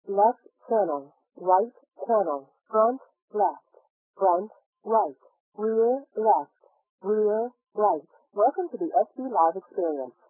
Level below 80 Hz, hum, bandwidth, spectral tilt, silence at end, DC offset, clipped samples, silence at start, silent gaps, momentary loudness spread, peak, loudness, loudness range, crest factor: under -90 dBFS; none; 1.8 kHz; -12.5 dB/octave; 0.2 s; under 0.1%; under 0.1%; 0.05 s; 3.22-3.28 s, 3.90-4.14 s, 4.66-4.73 s, 5.40-5.52 s, 6.89-6.98 s; 11 LU; -8 dBFS; -26 LUFS; 2 LU; 18 dB